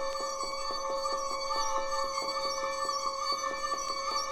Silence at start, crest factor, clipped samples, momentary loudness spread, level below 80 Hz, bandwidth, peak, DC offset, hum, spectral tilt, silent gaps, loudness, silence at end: 0 s; 14 dB; under 0.1%; 3 LU; -52 dBFS; 18 kHz; -18 dBFS; under 0.1%; none; -0.5 dB/octave; none; -32 LUFS; 0 s